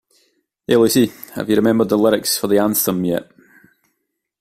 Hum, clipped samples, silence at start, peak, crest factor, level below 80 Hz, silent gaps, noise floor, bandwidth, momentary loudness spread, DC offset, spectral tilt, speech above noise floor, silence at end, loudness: none; under 0.1%; 0.7 s; -2 dBFS; 16 dB; -54 dBFS; none; -74 dBFS; 16 kHz; 8 LU; under 0.1%; -4.5 dB/octave; 58 dB; 1.15 s; -17 LUFS